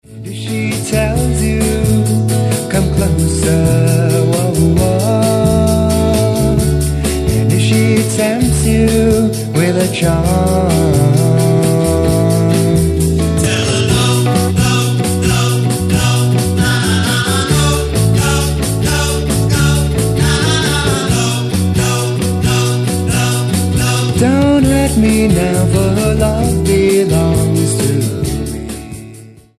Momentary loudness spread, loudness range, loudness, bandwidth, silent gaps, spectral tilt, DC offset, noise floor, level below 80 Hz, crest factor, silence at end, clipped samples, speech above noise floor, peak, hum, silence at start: 4 LU; 2 LU; -13 LUFS; 14.5 kHz; none; -5.5 dB/octave; under 0.1%; -36 dBFS; -24 dBFS; 12 dB; 0.3 s; under 0.1%; 25 dB; 0 dBFS; none; 0.1 s